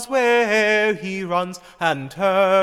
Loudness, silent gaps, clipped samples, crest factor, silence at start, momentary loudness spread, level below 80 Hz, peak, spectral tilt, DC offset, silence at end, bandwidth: -19 LUFS; none; under 0.1%; 14 dB; 0 s; 8 LU; -60 dBFS; -4 dBFS; -4.5 dB/octave; under 0.1%; 0 s; 15.5 kHz